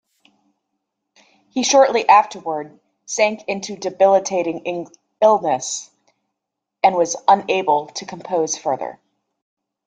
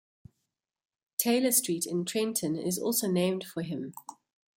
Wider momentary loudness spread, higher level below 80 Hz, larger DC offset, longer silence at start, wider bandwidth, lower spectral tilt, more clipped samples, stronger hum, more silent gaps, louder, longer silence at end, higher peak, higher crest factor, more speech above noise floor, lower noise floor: first, 15 LU vs 12 LU; first, -68 dBFS vs -74 dBFS; neither; first, 1.55 s vs 1.2 s; second, 9.4 kHz vs 17 kHz; second, -2.5 dB/octave vs -4 dB/octave; neither; neither; neither; first, -18 LUFS vs -29 LUFS; first, 0.95 s vs 0.45 s; first, -2 dBFS vs -10 dBFS; about the same, 18 dB vs 20 dB; first, 64 dB vs 54 dB; about the same, -81 dBFS vs -84 dBFS